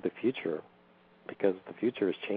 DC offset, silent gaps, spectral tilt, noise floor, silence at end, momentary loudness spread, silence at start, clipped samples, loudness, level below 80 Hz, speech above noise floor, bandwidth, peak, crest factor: under 0.1%; none; -5 dB/octave; -61 dBFS; 0 s; 13 LU; 0 s; under 0.1%; -33 LUFS; -80 dBFS; 28 dB; 4.9 kHz; -14 dBFS; 20 dB